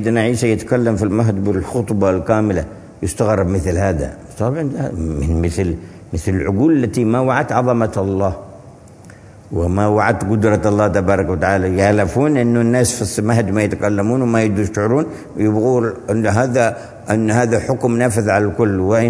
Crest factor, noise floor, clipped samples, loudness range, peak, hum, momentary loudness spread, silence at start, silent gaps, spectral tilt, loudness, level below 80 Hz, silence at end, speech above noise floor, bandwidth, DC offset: 16 dB; -40 dBFS; under 0.1%; 4 LU; 0 dBFS; none; 7 LU; 0 s; none; -6.5 dB/octave; -16 LUFS; -36 dBFS; 0 s; 24 dB; 11 kHz; under 0.1%